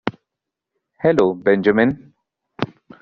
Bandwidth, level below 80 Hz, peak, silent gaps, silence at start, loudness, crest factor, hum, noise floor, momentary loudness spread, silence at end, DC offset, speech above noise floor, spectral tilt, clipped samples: 7.4 kHz; -56 dBFS; -2 dBFS; none; 0.05 s; -18 LUFS; 18 dB; none; -83 dBFS; 13 LU; 0.35 s; under 0.1%; 67 dB; -5.5 dB/octave; under 0.1%